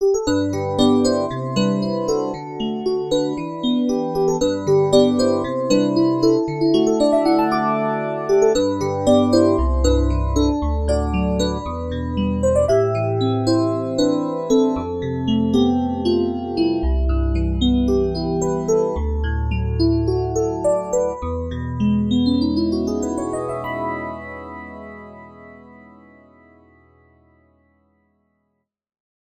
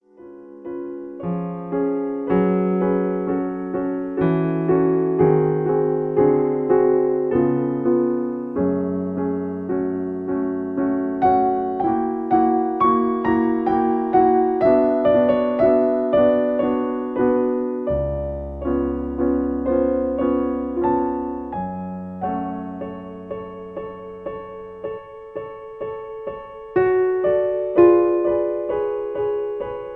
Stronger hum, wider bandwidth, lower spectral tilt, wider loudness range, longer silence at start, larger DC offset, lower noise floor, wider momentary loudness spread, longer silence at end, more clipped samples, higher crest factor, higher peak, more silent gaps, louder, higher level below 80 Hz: neither; first, 12 kHz vs 4.2 kHz; second, -6.5 dB/octave vs -11 dB/octave; second, 5 LU vs 11 LU; second, 0 s vs 0.2 s; neither; first, -74 dBFS vs -42 dBFS; second, 9 LU vs 15 LU; first, 3.6 s vs 0 s; neither; about the same, 16 dB vs 18 dB; about the same, -2 dBFS vs -2 dBFS; neither; about the same, -19 LUFS vs -20 LUFS; first, -30 dBFS vs -44 dBFS